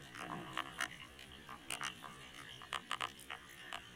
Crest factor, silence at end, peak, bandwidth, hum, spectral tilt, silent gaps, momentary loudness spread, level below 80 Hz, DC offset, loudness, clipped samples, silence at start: 28 dB; 0 s; -20 dBFS; 16.5 kHz; none; -2 dB/octave; none; 10 LU; -70 dBFS; under 0.1%; -45 LUFS; under 0.1%; 0 s